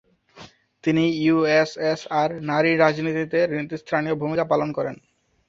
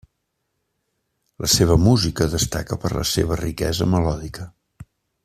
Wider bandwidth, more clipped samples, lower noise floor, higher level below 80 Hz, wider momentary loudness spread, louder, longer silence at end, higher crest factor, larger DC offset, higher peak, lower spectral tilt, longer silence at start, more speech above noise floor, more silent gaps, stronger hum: second, 7.6 kHz vs 15 kHz; neither; second, -48 dBFS vs -75 dBFS; second, -62 dBFS vs -36 dBFS; second, 8 LU vs 13 LU; about the same, -22 LUFS vs -20 LUFS; first, 0.55 s vs 0.4 s; about the same, 20 dB vs 18 dB; neither; about the same, -2 dBFS vs -2 dBFS; first, -6.5 dB/octave vs -5 dB/octave; second, 0.35 s vs 1.4 s; second, 26 dB vs 55 dB; neither; neither